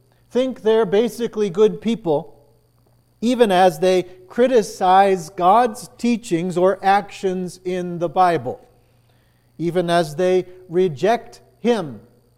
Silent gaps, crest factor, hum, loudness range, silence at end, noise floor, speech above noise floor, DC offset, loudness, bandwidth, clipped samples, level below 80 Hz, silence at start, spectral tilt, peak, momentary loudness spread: none; 18 dB; none; 5 LU; 0.4 s; -57 dBFS; 39 dB; under 0.1%; -19 LUFS; 15.5 kHz; under 0.1%; -56 dBFS; 0.35 s; -5.5 dB/octave; -2 dBFS; 10 LU